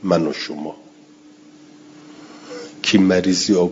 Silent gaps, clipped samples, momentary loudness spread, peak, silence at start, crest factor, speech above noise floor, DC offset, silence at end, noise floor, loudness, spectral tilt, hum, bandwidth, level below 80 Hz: none; under 0.1%; 21 LU; -2 dBFS; 0 s; 18 dB; 29 dB; under 0.1%; 0 s; -47 dBFS; -18 LUFS; -4.5 dB/octave; none; 7.8 kHz; -60 dBFS